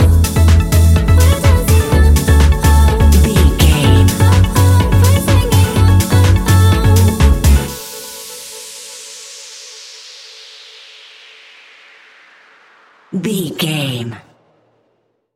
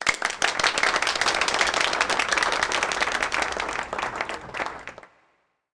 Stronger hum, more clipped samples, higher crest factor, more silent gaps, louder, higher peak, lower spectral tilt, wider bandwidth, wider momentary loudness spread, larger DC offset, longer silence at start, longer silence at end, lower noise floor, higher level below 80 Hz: neither; neither; second, 12 dB vs 18 dB; neither; first, -11 LUFS vs -23 LUFS; first, 0 dBFS vs -8 dBFS; first, -5.5 dB/octave vs -0.5 dB/octave; first, 17 kHz vs 10.5 kHz; first, 19 LU vs 10 LU; neither; about the same, 0 s vs 0 s; first, 1.15 s vs 0.65 s; second, -62 dBFS vs -68 dBFS; first, -16 dBFS vs -52 dBFS